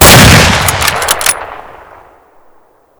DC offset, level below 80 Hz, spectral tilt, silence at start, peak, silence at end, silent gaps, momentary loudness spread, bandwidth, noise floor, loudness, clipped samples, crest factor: under 0.1%; -22 dBFS; -3 dB/octave; 0 s; 0 dBFS; 1.4 s; none; 15 LU; over 20 kHz; -45 dBFS; -6 LUFS; 10%; 8 dB